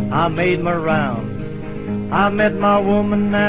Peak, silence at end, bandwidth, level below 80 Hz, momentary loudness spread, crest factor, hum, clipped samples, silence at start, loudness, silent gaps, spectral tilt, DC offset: -2 dBFS; 0 s; 4 kHz; -40 dBFS; 12 LU; 14 dB; none; under 0.1%; 0 s; -18 LUFS; none; -10.5 dB/octave; under 0.1%